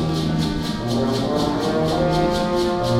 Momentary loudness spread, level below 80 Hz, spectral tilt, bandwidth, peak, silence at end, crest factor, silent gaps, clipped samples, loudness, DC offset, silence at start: 3 LU; -36 dBFS; -6 dB/octave; 15.5 kHz; -6 dBFS; 0 s; 14 dB; none; under 0.1%; -21 LUFS; under 0.1%; 0 s